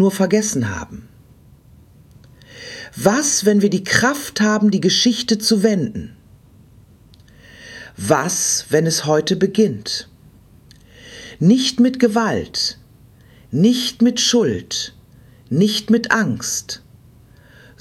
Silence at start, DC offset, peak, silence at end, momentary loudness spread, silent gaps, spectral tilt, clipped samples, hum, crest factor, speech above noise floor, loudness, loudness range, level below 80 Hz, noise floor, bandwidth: 0 s; under 0.1%; 0 dBFS; 1.05 s; 18 LU; none; -4 dB/octave; under 0.1%; none; 18 dB; 31 dB; -17 LUFS; 5 LU; -52 dBFS; -47 dBFS; 16.5 kHz